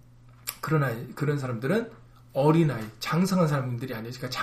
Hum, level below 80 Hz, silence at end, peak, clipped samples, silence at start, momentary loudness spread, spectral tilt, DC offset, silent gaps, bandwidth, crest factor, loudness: none; -58 dBFS; 0 s; -10 dBFS; under 0.1%; 0.45 s; 12 LU; -6.5 dB/octave; under 0.1%; none; 15.5 kHz; 18 dB; -27 LUFS